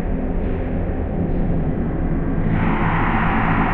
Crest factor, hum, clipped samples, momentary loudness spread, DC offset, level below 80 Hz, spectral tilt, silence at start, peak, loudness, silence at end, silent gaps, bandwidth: 14 dB; none; under 0.1%; 5 LU; under 0.1%; -24 dBFS; -10.5 dB/octave; 0 s; -4 dBFS; -21 LUFS; 0 s; none; 4 kHz